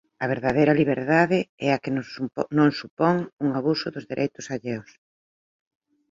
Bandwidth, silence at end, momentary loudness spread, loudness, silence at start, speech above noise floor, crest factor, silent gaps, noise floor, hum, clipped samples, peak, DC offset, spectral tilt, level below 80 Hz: 7.6 kHz; 1.3 s; 11 LU; -24 LUFS; 0.2 s; over 67 dB; 20 dB; 1.49-1.58 s, 2.90-2.97 s, 3.33-3.37 s; under -90 dBFS; none; under 0.1%; -4 dBFS; under 0.1%; -7 dB/octave; -60 dBFS